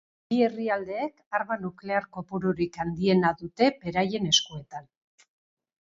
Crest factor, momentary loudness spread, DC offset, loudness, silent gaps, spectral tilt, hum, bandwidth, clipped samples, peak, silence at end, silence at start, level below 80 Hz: 20 dB; 11 LU; under 0.1%; -27 LUFS; 1.26-1.31 s; -4.5 dB/octave; none; 7.6 kHz; under 0.1%; -8 dBFS; 1.05 s; 0.3 s; -60 dBFS